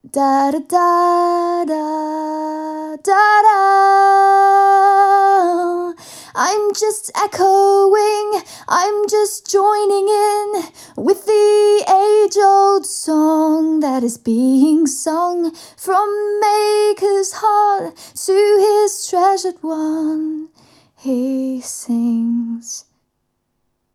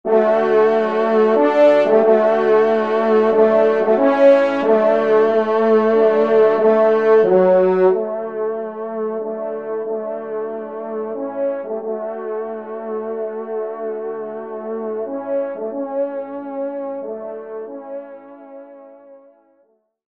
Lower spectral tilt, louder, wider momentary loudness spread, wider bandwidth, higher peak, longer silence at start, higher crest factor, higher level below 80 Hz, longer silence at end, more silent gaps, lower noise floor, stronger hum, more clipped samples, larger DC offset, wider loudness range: second, -3 dB/octave vs -7.5 dB/octave; about the same, -15 LUFS vs -17 LUFS; second, 12 LU vs 15 LU; first, 15.5 kHz vs 6.2 kHz; about the same, -2 dBFS vs -2 dBFS; about the same, 0.15 s vs 0.05 s; about the same, 14 dB vs 16 dB; about the same, -70 dBFS vs -70 dBFS; first, 1.15 s vs 0.95 s; neither; first, -70 dBFS vs -61 dBFS; neither; neither; second, under 0.1% vs 0.1%; second, 8 LU vs 13 LU